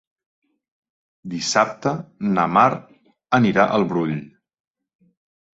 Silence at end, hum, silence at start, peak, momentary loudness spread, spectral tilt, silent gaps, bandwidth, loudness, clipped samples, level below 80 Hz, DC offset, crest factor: 1.3 s; none; 1.25 s; -2 dBFS; 14 LU; -5 dB/octave; none; 8 kHz; -20 LUFS; under 0.1%; -60 dBFS; under 0.1%; 20 dB